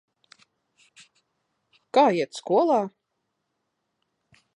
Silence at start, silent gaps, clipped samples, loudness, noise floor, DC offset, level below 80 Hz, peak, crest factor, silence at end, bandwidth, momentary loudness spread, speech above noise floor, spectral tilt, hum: 1.95 s; none; under 0.1%; -23 LUFS; -79 dBFS; under 0.1%; -84 dBFS; -8 dBFS; 20 dB; 1.7 s; 11 kHz; 7 LU; 57 dB; -5.5 dB/octave; none